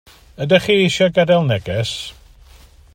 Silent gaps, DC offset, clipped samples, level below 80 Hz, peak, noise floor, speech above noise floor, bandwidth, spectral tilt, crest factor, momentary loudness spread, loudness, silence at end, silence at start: none; under 0.1%; under 0.1%; -46 dBFS; 0 dBFS; -45 dBFS; 29 dB; 16 kHz; -5.5 dB/octave; 18 dB; 14 LU; -16 LUFS; 0.8 s; 0.4 s